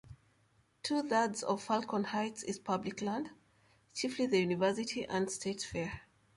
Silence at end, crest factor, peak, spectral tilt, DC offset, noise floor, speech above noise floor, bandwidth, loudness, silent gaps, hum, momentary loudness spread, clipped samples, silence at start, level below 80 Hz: 0.35 s; 18 dB; -18 dBFS; -4.5 dB/octave; under 0.1%; -71 dBFS; 37 dB; 11.5 kHz; -35 LUFS; none; none; 9 LU; under 0.1%; 0.05 s; -66 dBFS